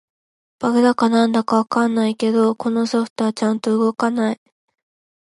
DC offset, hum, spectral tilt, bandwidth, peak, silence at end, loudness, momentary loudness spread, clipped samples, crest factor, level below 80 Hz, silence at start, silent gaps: under 0.1%; none; -5.5 dB/octave; 11.5 kHz; -2 dBFS; 0.9 s; -18 LUFS; 6 LU; under 0.1%; 16 dB; -68 dBFS; 0.6 s; 3.10-3.16 s